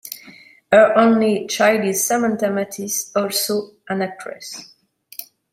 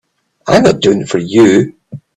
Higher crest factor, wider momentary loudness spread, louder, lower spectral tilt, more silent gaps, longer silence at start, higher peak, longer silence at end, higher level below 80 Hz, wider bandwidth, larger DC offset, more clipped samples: first, 18 dB vs 12 dB; first, 21 LU vs 10 LU; second, -18 LUFS vs -11 LUFS; second, -3.5 dB/octave vs -5.5 dB/octave; neither; second, 0.05 s vs 0.45 s; about the same, -2 dBFS vs 0 dBFS; about the same, 0.3 s vs 0.2 s; second, -66 dBFS vs -46 dBFS; first, 16.5 kHz vs 11 kHz; neither; neither